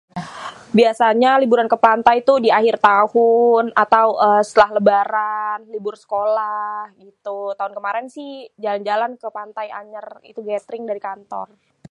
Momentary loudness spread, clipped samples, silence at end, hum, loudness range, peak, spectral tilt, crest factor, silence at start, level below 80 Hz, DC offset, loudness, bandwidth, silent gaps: 19 LU; under 0.1%; 0.45 s; none; 12 LU; 0 dBFS; -5.5 dB/octave; 18 dB; 0.15 s; -62 dBFS; under 0.1%; -17 LUFS; 11 kHz; none